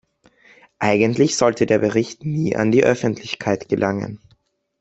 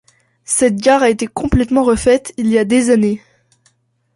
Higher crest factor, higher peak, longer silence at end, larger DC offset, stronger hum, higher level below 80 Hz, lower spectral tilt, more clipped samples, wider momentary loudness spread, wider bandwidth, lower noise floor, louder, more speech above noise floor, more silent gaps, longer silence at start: first, 18 dB vs 12 dB; about the same, -2 dBFS vs -2 dBFS; second, 0.65 s vs 1 s; neither; neither; second, -56 dBFS vs -34 dBFS; about the same, -5.5 dB/octave vs -5 dB/octave; neither; about the same, 8 LU vs 6 LU; second, 8.2 kHz vs 11.5 kHz; about the same, -60 dBFS vs -59 dBFS; second, -19 LUFS vs -14 LUFS; second, 42 dB vs 46 dB; neither; first, 0.8 s vs 0.5 s